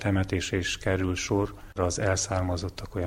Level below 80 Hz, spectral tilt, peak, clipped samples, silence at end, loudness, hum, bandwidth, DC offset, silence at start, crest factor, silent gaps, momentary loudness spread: -44 dBFS; -4.5 dB/octave; -10 dBFS; under 0.1%; 0 s; -28 LUFS; none; 15 kHz; under 0.1%; 0 s; 18 dB; none; 6 LU